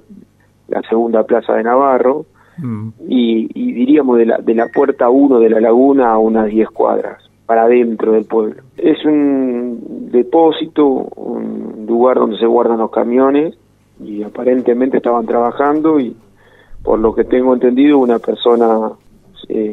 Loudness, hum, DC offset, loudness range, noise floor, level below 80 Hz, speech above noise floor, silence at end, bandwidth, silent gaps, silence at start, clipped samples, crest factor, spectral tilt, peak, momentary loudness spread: -13 LUFS; none; under 0.1%; 4 LU; -47 dBFS; -46 dBFS; 34 dB; 0 s; 4.1 kHz; none; 0.1 s; under 0.1%; 12 dB; -8.5 dB/octave; 0 dBFS; 13 LU